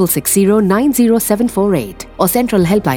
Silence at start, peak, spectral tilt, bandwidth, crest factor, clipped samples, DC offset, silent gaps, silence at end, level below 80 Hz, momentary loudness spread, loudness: 0 s; 0 dBFS; -5.5 dB/octave; over 20 kHz; 12 dB; under 0.1%; under 0.1%; none; 0 s; -40 dBFS; 5 LU; -13 LUFS